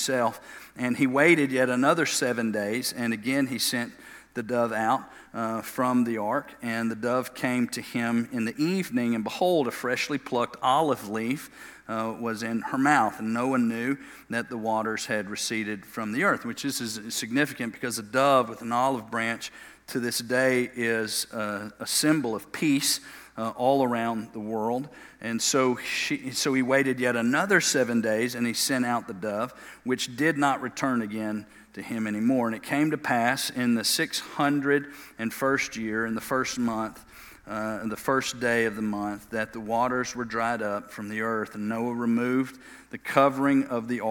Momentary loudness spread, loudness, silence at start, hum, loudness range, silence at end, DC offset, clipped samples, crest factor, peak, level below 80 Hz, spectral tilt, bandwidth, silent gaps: 11 LU; -27 LUFS; 0 s; none; 4 LU; 0 s; under 0.1%; under 0.1%; 24 dB; -4 dBFS; -66 dBFS; -4 dB/octave; 18 kHz; none